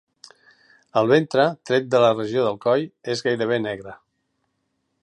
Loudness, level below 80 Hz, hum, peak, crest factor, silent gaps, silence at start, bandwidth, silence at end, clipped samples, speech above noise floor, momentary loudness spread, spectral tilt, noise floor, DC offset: -21 LUFS; -66 dBFS; none; -4 dBFS; 20 dB; none; 0.95 s; 11 kHz; 1.1 s; under 0.1%; 53 dB; 10 LU; -5.5 dB/octave; -73 dBFS; under 0.1%